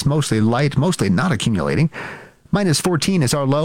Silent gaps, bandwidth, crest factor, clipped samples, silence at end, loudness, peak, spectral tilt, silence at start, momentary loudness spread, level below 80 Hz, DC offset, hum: none; 16.5 kHz; 12 dB; under 0.1%; 0 s; -18 LUFS; -6 dBFS; -5.5 dB/octave; 0 s; 6 LU; -44 dBFS; under 0.1%; none